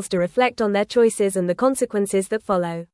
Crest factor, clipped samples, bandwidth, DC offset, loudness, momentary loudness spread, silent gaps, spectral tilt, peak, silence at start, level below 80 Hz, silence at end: 14 dB; under 0.1%; 12 kHz; under 0.1%; -21 LUFS; 5 LU; none; -5 dB/octave; -6 dBFS; 0 s; -58 dBFS; 0.1 s